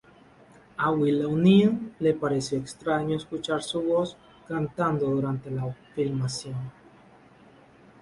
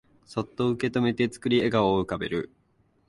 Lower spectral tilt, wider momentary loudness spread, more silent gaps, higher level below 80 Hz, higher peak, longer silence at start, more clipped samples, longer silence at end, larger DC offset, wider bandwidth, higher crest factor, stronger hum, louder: about the same, -6.5 dB/octave vs -6.5 dB/octave; about the same, 13 LU vs 11 LU; neither; second, -60 dBFS vs -54 dBFS; about the same, -8 dBFS vs -8 dBFS; first, 0.8 s vs 0.3 s; neither; first, 1.3 s vs 0.65 s; neither; about the same, 11.5 kHz vs 11.5 kHz; about the same, 18 dB vs 18 dB; neither; about the same, -26 LUFS vs -26 LUFS